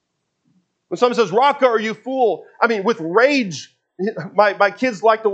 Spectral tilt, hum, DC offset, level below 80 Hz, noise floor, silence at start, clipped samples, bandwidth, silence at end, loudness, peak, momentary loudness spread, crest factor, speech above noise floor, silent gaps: -4.5 dB/octave; none; under 0.1%; -76 dBFS; -68 dBFS; 0.9 s; under 0.1%; 8.4 kHz; 0 s; -18 LUFS; 0 dBFS; 11 LU; 18 dB; 51 dB; none